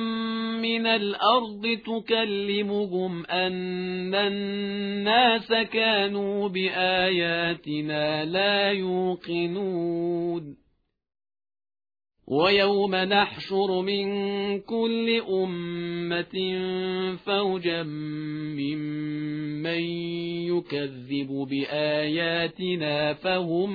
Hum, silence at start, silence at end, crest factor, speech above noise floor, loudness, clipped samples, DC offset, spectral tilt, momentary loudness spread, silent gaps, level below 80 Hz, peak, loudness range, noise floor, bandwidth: none; 0 s; 0 s; 18 dB; 45 dB; -26 LUFS; under 0.1%; under 0.1%; -7.5 dB/octave; 9 LU; none; -64 dBFS; -8 dBFS; 6 LU; -71 dBFS; 5 kHz